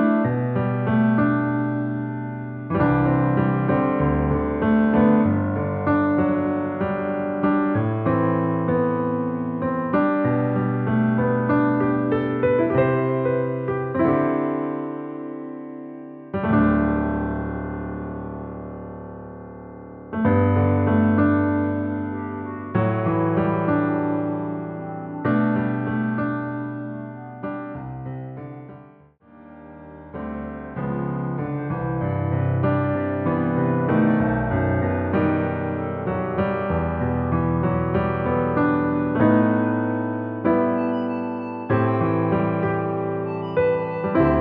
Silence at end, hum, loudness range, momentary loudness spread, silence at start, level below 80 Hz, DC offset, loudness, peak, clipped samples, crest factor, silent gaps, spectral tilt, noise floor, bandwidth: 0 s; none; 8 LU; 14 LU; 0 s; -42 dBFS; under 0.1%; -22 LUFS; -6 dBFS; under 0.1%; 16 dB; none; -8.5 dB/octave; -50 dBFS; 4.4 kHz